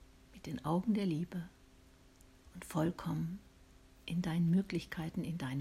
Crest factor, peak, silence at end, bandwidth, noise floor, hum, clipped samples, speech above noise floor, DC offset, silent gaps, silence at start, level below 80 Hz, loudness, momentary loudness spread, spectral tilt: 16 dB; -22 dBFS; 0 s; 15 kHz; -62 dBFS; none; under 0.1%; 26 dB; under 0.1%; none; 0 s; -62 dBFS; -37 LUFS; 19 LU; -7 dB/octave